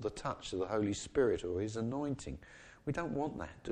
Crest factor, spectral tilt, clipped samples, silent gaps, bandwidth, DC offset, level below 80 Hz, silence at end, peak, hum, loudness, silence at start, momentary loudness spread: 18 dB; -5.5 dB/octave; under 0.1%; none; 10 kHz; under 0.1%; -56 dBFS; 0 s; -20 dBFS; none; -37 LUFS; 0 s; 12 LU